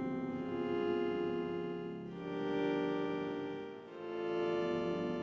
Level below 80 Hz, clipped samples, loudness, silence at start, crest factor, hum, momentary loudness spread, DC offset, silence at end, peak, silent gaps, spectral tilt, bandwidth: -70 dBFS; under 0.1%; -38 LUFS; 0 s; 14 dB; none; 9 LU; under 0.1%; 0 s; -24 dBFS; none; -7.5 dB/octave; 7.4 kHz